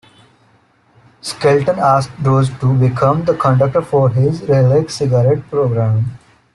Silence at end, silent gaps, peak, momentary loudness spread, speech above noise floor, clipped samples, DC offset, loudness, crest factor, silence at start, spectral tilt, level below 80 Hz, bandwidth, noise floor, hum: 0.35 s; none; -2 dBFS; 4 LU; 40 dB; under 0.1%; under 0.1%; -14 LUFS; 12 dB; 1.25 s; -7.5 dB/octave; -48 dBFS; 11.5 kHz; -53 dBFS; none